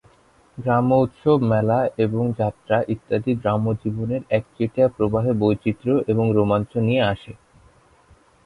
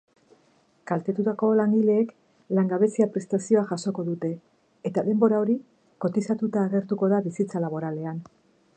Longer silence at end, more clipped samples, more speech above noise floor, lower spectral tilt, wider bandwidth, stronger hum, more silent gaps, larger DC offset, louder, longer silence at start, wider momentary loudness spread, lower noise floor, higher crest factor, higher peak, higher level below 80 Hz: first, 1.15 s vs 0.55 s; neither; second, 35 dB vs 39 dB; about the same, -9 dB/octave vs -8 dB/octave; first, 10.5 kHz vs 9.2 kHz; neither; neither; neither; first, -21 LUFS vs -25 LUFS; second, 0.55 s vs 0.85 s; second, 6 LU vs 10 LU; second, -56 dBFS vs -63 dBFS; about the same, 16 dB vs 18 dB; about the same, -4 dBFS vs -6 dBFS; first, -50 dBFS vs -74 dBFS